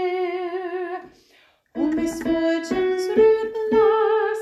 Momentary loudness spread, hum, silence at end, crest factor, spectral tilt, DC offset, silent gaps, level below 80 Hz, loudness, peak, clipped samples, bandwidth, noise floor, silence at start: 12 LU; none; 0 s; 14 dB; -5 dB/octave; under 0.1%; none; -54 dBFS; -21 LUFS; -6 dBFS; under 0.1%; 13.5 kHz; -58 dBFS; 0 s